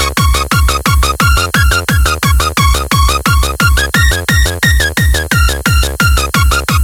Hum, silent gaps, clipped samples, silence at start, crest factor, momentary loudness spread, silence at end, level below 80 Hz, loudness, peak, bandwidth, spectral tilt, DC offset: none; none; under 0.1%; 0 s; 10 dB; 2 LU; 0 s; -14 dBFS; -11 LUFS; 0 dBFS; 17 kHz; -3.5 dB/octave; under 0.1%